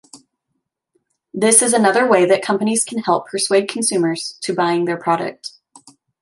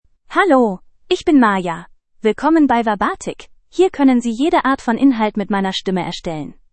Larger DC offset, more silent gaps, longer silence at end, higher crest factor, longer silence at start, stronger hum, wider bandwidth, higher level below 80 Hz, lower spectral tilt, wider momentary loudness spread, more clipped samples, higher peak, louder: neither; neither; first, 0.75 s vs 0.2 s; about the same, 18 dB vs 16 dB; second, 0.15 s vs 0.3 s; neither; first, 12 kHz vs 8.8 kHz; second, -68 dBFS vs -46 dBFS; second, -3 dB/octave vs -5.5 dB/octave; about the same, 12 LU vs 14 LU; neither; about the same, 0 dBFS vs 0 dBFS; about the same, -16 LUFS vs -16 LUFS